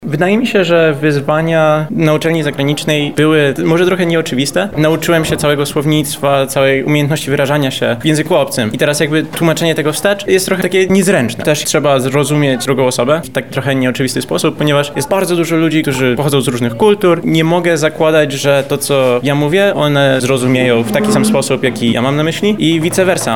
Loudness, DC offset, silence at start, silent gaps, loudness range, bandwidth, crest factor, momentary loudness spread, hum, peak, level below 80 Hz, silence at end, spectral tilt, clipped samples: -12 LUFS; 1%; 0 s; none; 2 LU; 18.5 kHz; 12 dB; 3 LU; none; 0 dBFS; -46 dBFS; 0 s; -5 dB/octave; under 0.1%